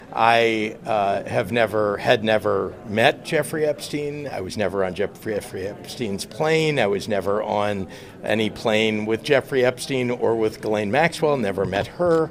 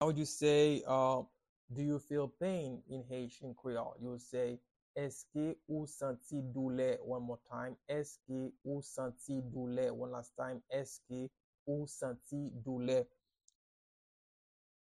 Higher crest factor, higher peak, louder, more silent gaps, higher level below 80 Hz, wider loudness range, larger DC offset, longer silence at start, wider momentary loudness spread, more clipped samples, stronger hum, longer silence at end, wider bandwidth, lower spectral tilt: about the same, 20 dB vs 20 dB; first, -2 dBFS vs -20 dBFS; first, -22 LUFS vs -39 LUFS; second, none vs 1.49-1.68 s, 4.71-4.75 s, 4.82-4.94 s, 11.44-11.53 s, 11.59-11.66 s; first, -54 dBFS vs -72 dBFS; about the same, 3 LU vs 5 LU; neither; about the same, 0 s vs 0 s; second, 9 LU vs 13 LU; neither; neither; second, 0 s vs 1.8 s; first, 16 kHz vs 13 kHz; about the same, -5 dB/octave vs -6 dB/octave